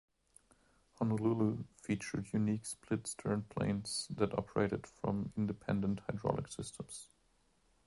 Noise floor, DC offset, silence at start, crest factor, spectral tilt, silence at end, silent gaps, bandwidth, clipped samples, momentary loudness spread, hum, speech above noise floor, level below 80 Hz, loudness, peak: -74 dBFS; under 0.1%; 1 s; 22 dB; -6 dB/octave; 0.8 s; none; 11.5 kHz; under 0.1%; 9 LU; none; 37 dB; -62 dBFS; -38 LUFS; -16 dBFS